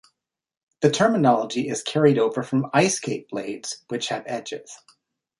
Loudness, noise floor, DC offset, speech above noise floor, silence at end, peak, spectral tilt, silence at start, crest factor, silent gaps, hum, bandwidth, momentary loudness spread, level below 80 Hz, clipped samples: -23 LUFS; -80 dBFS; under 0.1%; 57 dB; 0.65 s; -4 dBFS; -4.5 dB/octave; 0.8 s; 20 dB; none; none; 11.5 kHz; 13 LU; -66 dBFS; under 0.1%